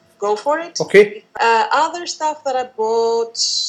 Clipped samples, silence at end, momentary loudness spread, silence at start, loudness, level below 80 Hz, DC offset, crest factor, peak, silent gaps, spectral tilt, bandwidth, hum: under 0.1%; 0 s; 9 LU; 0.2 s; -17 LUFS; -68 dBFS; under 0.1%; 16 dB; 0 dBFS; none; -2 dB/octave; 10.5 kHz; none